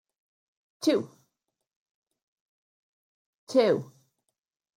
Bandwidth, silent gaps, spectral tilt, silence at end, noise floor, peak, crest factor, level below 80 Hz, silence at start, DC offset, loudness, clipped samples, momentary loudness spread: 16 kHz; 1.76-2.02 s, 2.22-3.47 s; -5 dB/octave; 0.9 s; -83 dBFS; -10 dBFS; 22 dB; -82 dBFS; 0.8 s; under 0.1%; -27 LUFS; under 0.1%; 7 LU